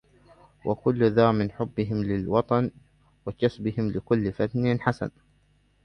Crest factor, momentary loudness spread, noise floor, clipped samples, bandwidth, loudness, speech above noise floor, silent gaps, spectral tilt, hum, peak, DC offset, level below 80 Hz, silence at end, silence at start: 20 dB; 11 LU; -64 dBFS; under 0.1%; 9.4 kHz; -26 LUFS; 39 dB; none; -9 dB/octave; 50 Hz at -50 dBFS; -6 dBFS; under 0.1%; -52 dBFS; 0.75 s; 0.65 s